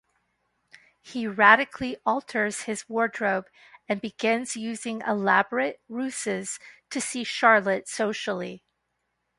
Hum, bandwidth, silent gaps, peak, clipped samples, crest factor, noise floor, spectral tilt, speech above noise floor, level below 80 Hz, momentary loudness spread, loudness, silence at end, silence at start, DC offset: none; 11.5 kHz; none; -2 dBFS; under 0.1%; 26 dB; -78 dBFS; -3.5 dB/octave; 52 dB; -68 dBFS; 13 LU; -25 LUFS; 0.8 s; 1.05 s; under 0.1%